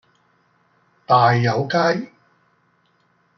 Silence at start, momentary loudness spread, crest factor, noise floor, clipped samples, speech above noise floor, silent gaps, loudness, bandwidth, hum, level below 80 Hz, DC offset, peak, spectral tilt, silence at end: 1.1 s; 11 LU; 20 dB; -62 dBFS; under 0.1%; 46 dB; none; -18 LUFS; 6.4 kHz; none; -66 dBFS; under 0.1%; -2 dBFS; -6.5 dB/octave; 1.3 s